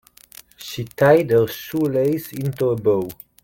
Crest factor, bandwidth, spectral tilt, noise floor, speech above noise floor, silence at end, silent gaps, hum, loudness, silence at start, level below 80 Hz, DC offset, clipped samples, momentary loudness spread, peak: 18 dB; 17 kHz; -6.5 dB/octave; -47 dBFS; 28 dB; 0.3 s; none; none; -19 LUFS; 0.6 s; -56 dBFS; under 0.1%; under 0.1%; 16 LU; -2 dBFS